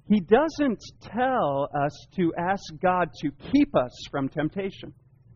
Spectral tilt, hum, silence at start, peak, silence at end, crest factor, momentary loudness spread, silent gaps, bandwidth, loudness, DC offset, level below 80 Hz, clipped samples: -5.5 dB/octave; none; 0.1 s; -6 dBFS; 0.45 s; 20 dB; 12 LU; none; 7.2 kHz; -26 LUFS; under 0.1%; -52 dBFS; under 0.1%